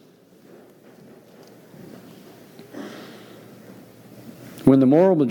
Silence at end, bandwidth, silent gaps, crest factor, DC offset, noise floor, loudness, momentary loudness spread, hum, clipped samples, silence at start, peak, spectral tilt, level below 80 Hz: 0 s; 18.5 kHz; none; 20 dB; under 0.1%; -51 dBFS; -16 LUFS; 29 LU; none; under 0.1%; 2.75 s; -4 dBFS; -8.5 dB/octave; -62 dBFS